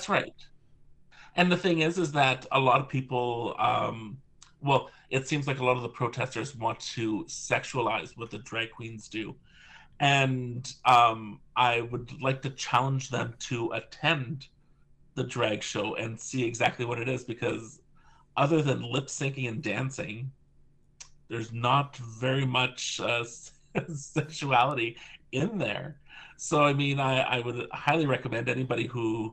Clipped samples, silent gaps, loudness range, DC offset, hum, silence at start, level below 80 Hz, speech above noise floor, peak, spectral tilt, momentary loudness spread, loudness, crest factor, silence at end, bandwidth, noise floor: under 0.1%; none; 5 LU; under 0.1%; none; 0 s; -60 dBFS; 31 dB; -10 dBFS; -5 dB/octave; 13 LU; -29 LUFS; 20 dB; 0 s; 9.2 kHz; -60 dBFS